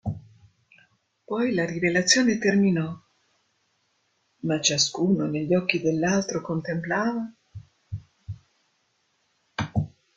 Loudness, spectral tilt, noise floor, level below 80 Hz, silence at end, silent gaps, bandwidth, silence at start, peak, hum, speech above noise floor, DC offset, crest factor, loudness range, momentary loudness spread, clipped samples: -24 LUFS; -4 dB/octave; -71 dBFS; -58 dBFS; 0.25 s; none; 9.4 kHz; 0.05 s; -4 dBFS; none; 47 dB; under 0.1%; 22 dB; 8 LU; 20 LU; under 0.1%